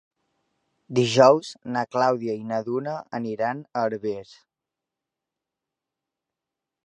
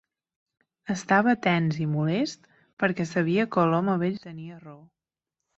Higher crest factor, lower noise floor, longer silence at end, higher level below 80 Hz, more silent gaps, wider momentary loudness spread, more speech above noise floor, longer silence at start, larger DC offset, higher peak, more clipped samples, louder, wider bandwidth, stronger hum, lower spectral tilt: about the same, 24 dB vs 20 dB; about the same, -87 dBFS vs -87 dBFS; first, 2.6 s vs 0.8 s; second, -72 dBFS vs -66 dBFS; second, none vs 2.73-2.77 s; second, 14 LU vs 19 LU; about the same, 64 dB vs 62 dB; about the same, 0.9 s vs 0.85 s; neither; first, -2 dBFS vs -6 dBFS; neither; about the same, -24 LUFS vs -25 LUFS; first, 10.5 kHz vs 8 kHz; neither; about the same, -5.5 dB/octave vs -6.5 dB/octave